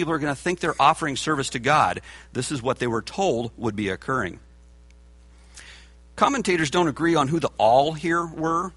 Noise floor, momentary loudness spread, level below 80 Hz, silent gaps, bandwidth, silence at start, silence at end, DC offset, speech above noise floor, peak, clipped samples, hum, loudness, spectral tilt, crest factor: -50 dBFS; 9 LU; -50 dBFS; none; 11.5 kHz; 0 s; 0.05 s; under 0.1%; 27 dB; -4 dBFS; under 0.1%; none; -23 LUFS; -4.5 dB/octave; 20 dB